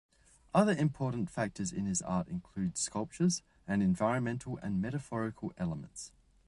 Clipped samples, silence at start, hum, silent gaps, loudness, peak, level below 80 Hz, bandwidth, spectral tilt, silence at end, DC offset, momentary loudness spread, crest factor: under 0.1%; 0.55 s; none; none; -34 LUFS; -12 dBFS; -60 dBFS; 11.5 kHz; -5.5 dB/octave; 0.4 s; under 0.1%; 9 LU; 22 dB